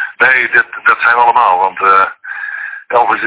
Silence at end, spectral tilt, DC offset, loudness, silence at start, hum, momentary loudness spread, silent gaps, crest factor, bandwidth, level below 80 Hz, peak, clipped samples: 0 s; -5.5 dB/octave; under 0.1%; -10 LUFS; 0 s; none; 13 LU; none; 12 dB; 4 kHz; -58 dBFS; 0 dBFS; 0.9%